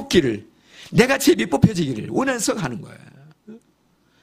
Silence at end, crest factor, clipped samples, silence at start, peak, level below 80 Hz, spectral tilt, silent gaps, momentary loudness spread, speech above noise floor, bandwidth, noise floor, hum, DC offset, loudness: 0.65 s; 20 dB; under 0.1%; 0 s; 0 dBFS; -46 dBFS; -5 dB/octave; none; 14 LU; 42 dB; 15.5 kHz; -61 dBFS; none; under 0.1%; -20 LUFS